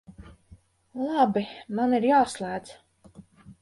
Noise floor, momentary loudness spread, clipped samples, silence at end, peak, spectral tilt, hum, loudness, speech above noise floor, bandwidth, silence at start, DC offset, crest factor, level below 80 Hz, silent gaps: -55 dBFS; 13 LU; under 0.1%; 0.1 s; -8 dBFS; -5.5 dB/octave; none; -25 LUFS; 31 dB; 11.5 kHz; 0.1 s; under 0.1%; 18 dB; -60 dBFS; none